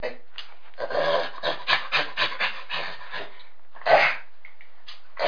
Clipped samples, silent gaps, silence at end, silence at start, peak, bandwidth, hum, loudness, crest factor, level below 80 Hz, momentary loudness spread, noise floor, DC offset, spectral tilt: under 0.1%; none; 0 s; 0 s; -4 dBFS; 5.4 kHz; none; -24 LUFS; 22 dB; -68 dBFS; 22 LU; -53 dBFS; 3%; -3 dB/octave